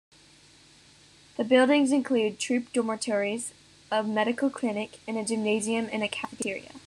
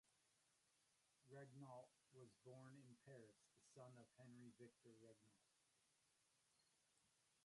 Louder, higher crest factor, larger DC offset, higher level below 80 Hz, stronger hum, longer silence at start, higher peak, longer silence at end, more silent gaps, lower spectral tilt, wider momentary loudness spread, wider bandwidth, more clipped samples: first, -27 LUFS vs -66 LUFS; about the same, 20 dB vs 18 dB; neither; first, -72 dBFS vs under -90 dBFS; neither; first, 1.4 s vs 0.05 s; first, -8 dBFS vs -50 dBFS; about the same, 0.1 s vs 0 s; neither; second, -3.5 dB/octave vs -5.5 dB/octave; first, 12 LU vs 5 LU; first, 12.5 kHz vs 11 kHz; neither